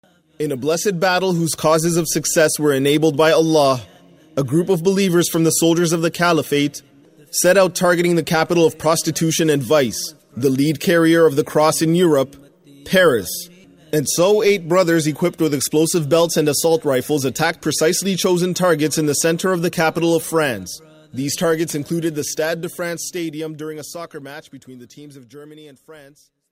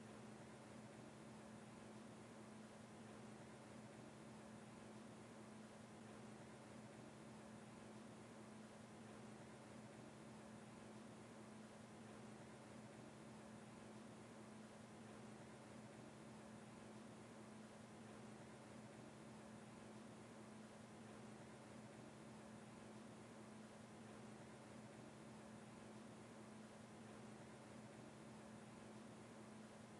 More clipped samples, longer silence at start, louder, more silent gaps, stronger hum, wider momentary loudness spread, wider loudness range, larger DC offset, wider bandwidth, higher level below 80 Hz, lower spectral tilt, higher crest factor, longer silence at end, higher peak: neither; first, 0.4 s vs 0 s; first, -17 LUFS vs -60 LUFS; neither; neither; first, 12 LU vs 1 LU; first, 6 LU vs 0 LU; neither; first, 16 kHz vs 11.5 kHz; first, -56 dBFS vs -86 dBFS; about the same, -4.5 dB/octave vs -5 dB/octave; about the same, 14 dB vs 12 dB; first, 0.5 s vs 0 s; first, -4 dBFS vs -48 dBFS